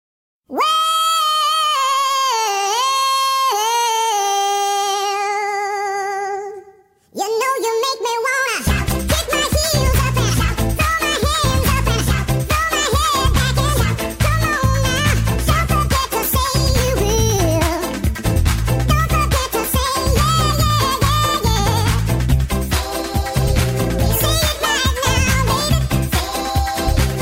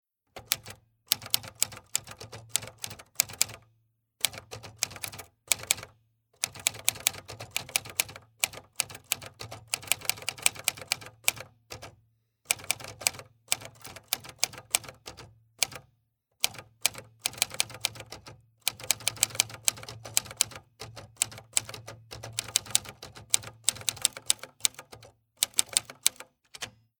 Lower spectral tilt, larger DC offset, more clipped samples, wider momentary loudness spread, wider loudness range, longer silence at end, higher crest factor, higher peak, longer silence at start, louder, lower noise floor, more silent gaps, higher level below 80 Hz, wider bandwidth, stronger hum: first, -4 dB/octave vs 0.5 dB/octave; neither; neither; second, 4 LU vs 19 LU; about the same, 3 LU vs 3 LU; second, 0 s vs 0.3 s; second, 14 dB vs 34 dB; about the same, -2 dBFS vs 0 dBFS; first, 0.5 s vs 0.35 s; first, -17 LUFS vs -30 LUFS; second, -48 dBFS vs -74 dBFS; neither; first, -24 dBFS vs -64 dBFS; second, 16.5 kHz vs 19.5 kHz; neither